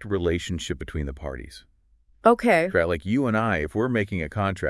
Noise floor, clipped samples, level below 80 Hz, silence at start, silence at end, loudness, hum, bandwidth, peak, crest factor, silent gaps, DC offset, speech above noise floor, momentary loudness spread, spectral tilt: -60 dBFS; under 0.1%; -44 dBFS; 0 s; 0 s; -24 LUFS; none; 12 kHz; -4 dBFS; 22 dB; none; under 0.1%; 36 dB; 13 LU; -6.5 dB/octave